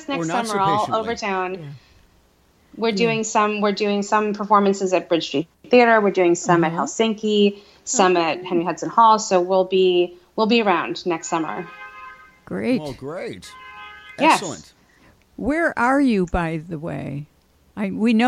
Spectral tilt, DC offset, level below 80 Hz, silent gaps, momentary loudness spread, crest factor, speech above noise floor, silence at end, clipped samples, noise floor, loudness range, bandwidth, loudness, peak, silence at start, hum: -4.5 dB/octave; under 0.1%; -48 dBFS; none; 17 LU; 18 dB; 38 dB; 0 s; under 0.1%; -58 dBFS; 6 LU; 13 kHz; -20 LUFS; -2 dBFS; 0 s; none